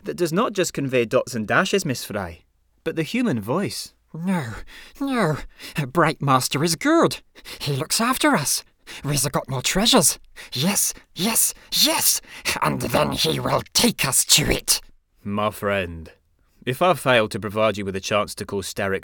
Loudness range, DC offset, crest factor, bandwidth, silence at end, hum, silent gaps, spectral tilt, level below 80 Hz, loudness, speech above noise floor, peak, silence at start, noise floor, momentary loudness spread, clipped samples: 6 LU; under 0.1%; 20 dB; over 20 kHz; 0 s; none; none; -3 dB/octave; -46 dBFS; -21 LUFS; 34 dB; -2 dBFS; 0.05 s; -56 dBFS; 14 LU; under 0.1%